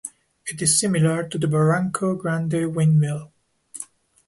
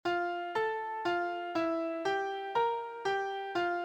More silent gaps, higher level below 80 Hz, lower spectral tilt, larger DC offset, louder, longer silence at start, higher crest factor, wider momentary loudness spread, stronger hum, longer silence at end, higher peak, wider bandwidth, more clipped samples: neither; first, -60 dBFS vs -72 dBFS; about the same, -5 dB/octave vs -4.5 dB/octave; neither; first, -21 LUFS vs -34 LUFS; about the same, 0.05 s vs 0.05 s; about the same, 16 dB vs 14 dB; first, 18 LU vs 3 LU; neither; first, 0.45 s vs 0 s; first, -6 dBFS vs -20 dBFS; first, 11.5 kHz vs 9.4 kHz; neither